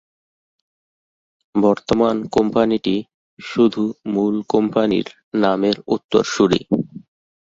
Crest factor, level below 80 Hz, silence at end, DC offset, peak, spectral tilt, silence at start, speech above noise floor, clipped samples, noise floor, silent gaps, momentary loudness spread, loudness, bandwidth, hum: 18 dB; -54 dBFS; 0.6 s; under 0.1%; -2 dBFS; -6 dB/octave; 1.55 s; over 72 dB; under 0.1%; under -90 dBFS; 3.14-3.37 s, 5.24-5.32 s, 6.04-6.09 s; 8 LU; -19 LUFS; 7.8 kHz; none